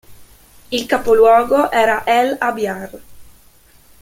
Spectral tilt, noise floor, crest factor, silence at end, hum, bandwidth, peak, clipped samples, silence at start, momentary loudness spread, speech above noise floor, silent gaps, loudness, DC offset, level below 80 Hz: -4 dB/octave; -48 dBFS; 16 dB; 0.8 s; none; 16.5 kHz; -2 dBFS; under 0.1%; 0.1 s; 13 LU; 34 dB; none; -15 LUFS; under 0.1%; -48 dBFS